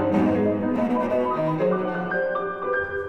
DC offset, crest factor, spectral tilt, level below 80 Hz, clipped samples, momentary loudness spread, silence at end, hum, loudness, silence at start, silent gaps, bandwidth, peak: under 0.1%; 12 dB; -8.5 dB/octave; -56 dBFS; under 0.1%; 5 LU; 0 s; none; -24 LUFS; 0 s; none; 8.4 kHz; -10 dBFS